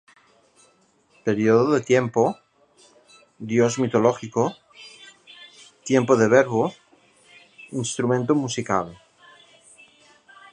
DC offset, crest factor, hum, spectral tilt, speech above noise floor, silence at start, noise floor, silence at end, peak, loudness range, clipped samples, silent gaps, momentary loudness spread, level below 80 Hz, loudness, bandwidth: under 0.1%; 22 dB; none; -5.5 dB/octave; 41 dB; 1.25 s; -61 dBFS; 1.6 s; -2 dBFS; 5 LU; under 0.1%; none; 22 LU; -64 dBFS; -21 LUFS; 10.5 kHz